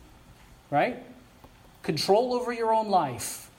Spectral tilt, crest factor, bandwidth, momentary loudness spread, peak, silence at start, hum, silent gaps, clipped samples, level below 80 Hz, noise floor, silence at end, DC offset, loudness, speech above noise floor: -4 dB/octave; 20 dB; 17 kHz; 10 LU; -10 dBFS; 0.3 s; none; none; under 0.1%; -60 dBFS; -53 dBFS; 0.1 s; under 0.1%; -27 LUFS; 27 dB